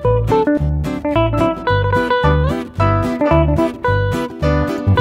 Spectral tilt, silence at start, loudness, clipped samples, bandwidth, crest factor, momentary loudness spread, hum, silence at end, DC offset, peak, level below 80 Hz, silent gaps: -8 dB/octave; 0 s; -16 LUFS; under 0.1%; 13.5 kHz; 14 dB; 4 LU; none; 0 s; under 0.1%; -2 dBFS; -24 dBFS; none